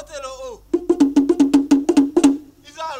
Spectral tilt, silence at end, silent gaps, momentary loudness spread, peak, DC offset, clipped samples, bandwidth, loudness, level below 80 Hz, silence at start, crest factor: -4.5 dB/octave; 0 s; none; 17 LU; -2 dBFS; under 0.1%; under 0.1%; 11.5 kHz; -16 LUFS; -50 dBFS; 0 s; 16 dB